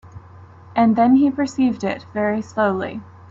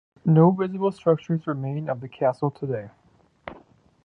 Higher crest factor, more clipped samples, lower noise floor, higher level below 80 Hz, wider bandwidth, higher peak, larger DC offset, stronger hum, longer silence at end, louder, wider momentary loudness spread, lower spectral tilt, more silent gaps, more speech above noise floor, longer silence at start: second, 14 dB vs 20 dB; neither; second, -43 dBFS vs -54 dBFS; first, -58 dBFS vs -64 dBFS; first, 7.6 kHz vs 6.2 kHz; about the same, -6 dBFS vs -4 dBFS; neither; neither; second, 0.25 s vs 0.5 s; first, -19 LUFS vs -24 LUFS; second, 12 LU vs 23 LU; second, -7 dB/octave vs -10 dB/octave; neither; second, 25 dB vs 31 dB; second, 0.05 s vs 0.25 s